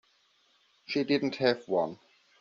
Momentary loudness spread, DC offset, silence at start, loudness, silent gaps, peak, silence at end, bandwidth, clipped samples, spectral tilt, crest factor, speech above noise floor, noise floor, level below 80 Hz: 7 LU; under 0.1%; 0.9 s; -30 LUFS; none; -10 dBFS; 0.45 s; 7.4 kHz; under 0.1%; -3.5 dB/octave; 22 dB; 39 dB; -68 dBFS; -74 dBFS